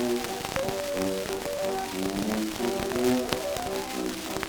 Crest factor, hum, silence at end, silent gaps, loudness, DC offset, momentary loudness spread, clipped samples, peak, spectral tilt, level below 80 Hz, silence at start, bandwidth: 24 dB; none; 0 s; none; -29 LUFS; under 0.1%; 6 LU; under 0.1%; -4 dBFS; -4 dB/octave; -50 dBFS; 0 s; over 20 kHz